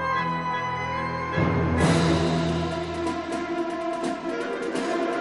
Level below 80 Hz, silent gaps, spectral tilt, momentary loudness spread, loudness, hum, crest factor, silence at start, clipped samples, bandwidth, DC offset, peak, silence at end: -44 dBFS; none; -6 dB/octave; 7 LU; -26 LUFS; none; 16 dB; 0 s; under 0.1%; 11.5 kHz; under 0.1%; -8 dBFS; 0 s